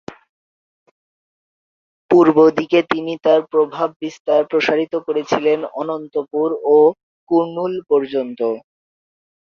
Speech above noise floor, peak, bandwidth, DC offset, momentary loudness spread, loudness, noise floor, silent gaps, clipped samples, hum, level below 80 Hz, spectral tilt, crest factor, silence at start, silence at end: over 74 dB; 0 dBFS; 7 kHz; under 0.1%; 10 LU; -17 LUFS; under -90 dBFS; 0.29-2.09 s, 3.96-4.00 s, 4.20-4.25 s, 7.03-7.27 s; under 0.1%; none; -64 dBFS; -6.5 dB/octave; 18 dB; 0.1 s; 0.95 s